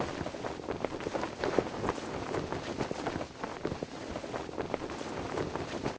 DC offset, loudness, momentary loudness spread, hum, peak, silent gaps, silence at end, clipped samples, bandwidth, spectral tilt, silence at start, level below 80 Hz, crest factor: under 0.1%; -37 LUFS; 7 LU; none; -10 dBFS; none; 0 s; under 0.1%; 8 kHz; -5.5 dB/octave; 0 s; -54 dBFS; 26 dB